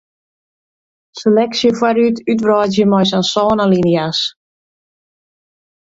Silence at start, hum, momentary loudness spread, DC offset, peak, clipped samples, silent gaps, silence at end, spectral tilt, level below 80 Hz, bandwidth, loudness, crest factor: 1.15 s; none; 5 LU; under 0.1%; 0 dBFS; under 0.1%; none; 1.55 s; -5.5 dB/octave; -54 dBFS; 7.8 kHz; -14 LUFS; 14 dB